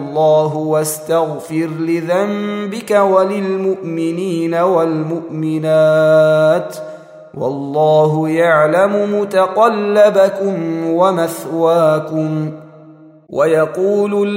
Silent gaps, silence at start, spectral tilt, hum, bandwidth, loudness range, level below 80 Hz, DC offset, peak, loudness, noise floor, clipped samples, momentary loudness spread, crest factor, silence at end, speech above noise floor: none; 0 s; -6.5 dB/octave; none; 16 kHz; 3 LU; -64 dBFS; under 0.1%; 0 dBFS; -14 LUFS; -41 dBFS; under 0.1%; 10 LU; 14 dB; 0 s; 27 dB